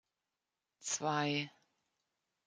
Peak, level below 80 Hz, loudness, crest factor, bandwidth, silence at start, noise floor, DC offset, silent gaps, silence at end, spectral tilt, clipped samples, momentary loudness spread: -22 dBFS; -86 dBFS; -37 LUFS; 20 dB; 10 kHz; 0.8 s; under -90 dBFS; under 0.1%; none; 1 s; -3 dB/octave; under 0.1%; 13 LU